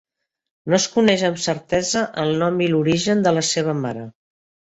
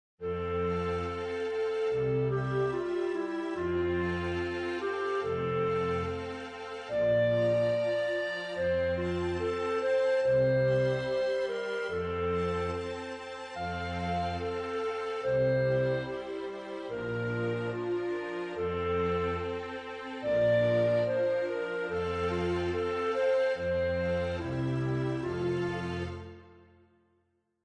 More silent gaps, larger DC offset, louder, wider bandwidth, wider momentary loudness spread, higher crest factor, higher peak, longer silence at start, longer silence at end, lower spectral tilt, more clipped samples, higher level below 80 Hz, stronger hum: neither; neither; first, -19 LUFS vs -31 LUFS; second, 8.2 kHz vs 9.8 kHz; about the same, 10 LU vs 10 LU; about the same, 18 dB vs 14 dB; first, -2 dBFS vs -18 dBFS; first, 0.65 s vs 0.2 s; second, 0.6 s vs 1.05 s; second, -4.5 dB/octave vs -7 dB/octave; neither; about the same, -56 dBFS vs -54 dBFS; neither